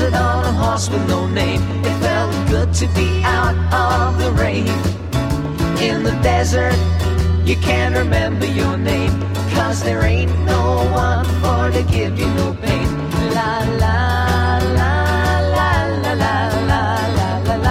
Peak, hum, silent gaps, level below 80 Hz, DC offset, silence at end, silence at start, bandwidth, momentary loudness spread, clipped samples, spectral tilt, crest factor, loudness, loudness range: -2 dBFS; none; none; -24 dBFS; 0.3%; 0 s; 0 s; 14.5 kHz; 3 LU; under 0.1%; -6 dB/octave; 14 dB; -17 LUFS; 1 LU